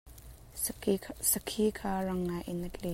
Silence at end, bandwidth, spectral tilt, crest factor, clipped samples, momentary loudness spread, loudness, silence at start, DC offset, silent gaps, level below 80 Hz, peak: 0 s; 16 kHz; -4 dB/octave; 22 dB; under 0.1%; 13 LU; -33 LUFS; 0.05 s; under 0.1%; none; -52 dBFS; -12 dBFS